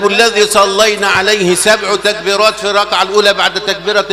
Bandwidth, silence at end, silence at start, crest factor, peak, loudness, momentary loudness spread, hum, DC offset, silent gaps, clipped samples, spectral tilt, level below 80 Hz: 16 kHz; 0 s; 0 s; 10 dB; 0 dBFS; -10 LUFS; 4 LU; none; under 0.1%; none; 0.4%; -2 dB/octave; -46 dBFS